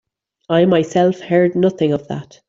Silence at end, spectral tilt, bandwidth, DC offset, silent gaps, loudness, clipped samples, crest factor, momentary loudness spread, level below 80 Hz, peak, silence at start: 0.25 s; -7 dB/octave; 7.8 kHz; under 0.1%; none; -16 LUFS; under 0.1%; 14 dB; 6 LU; -56 dBFS; -4 dBFS; 0.5 s